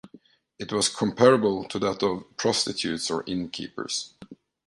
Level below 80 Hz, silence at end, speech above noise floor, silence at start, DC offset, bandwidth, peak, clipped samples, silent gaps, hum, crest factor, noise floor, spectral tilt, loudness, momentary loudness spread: -60 dBFS; 0.35 s; 30 dB; 0.05 s; under 0.1%; 11.5 kHz; -6 dBFS; under 0.1%; none; none; 22 dB; -55 dBFS; -3.5 dB/octave; -25 LUFS; 13 LU